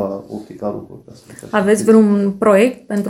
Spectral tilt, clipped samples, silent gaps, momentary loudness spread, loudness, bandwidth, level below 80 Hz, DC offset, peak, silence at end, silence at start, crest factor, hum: -6.5 dB/octave; under 0.1%; none; 17 LU; -15 LUFS; 14 kHz; -56 dBFS; under 0.1%; 0 dBFS; 0 s; 0 s; 16 dB; none